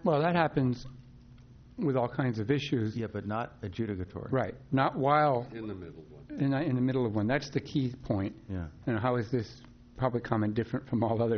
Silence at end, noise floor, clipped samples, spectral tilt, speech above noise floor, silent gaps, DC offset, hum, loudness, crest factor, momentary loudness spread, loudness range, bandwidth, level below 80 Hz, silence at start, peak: 0 s; -53 dBFS; under 0.1%; -6.5 dB/octave; 23 dB; none; under 0.1%; none; -31 LUFS; 18 dB; 13 LU; 3 LU; 6.6 kHz; -56 dBFS; 0 s; -12 dBFS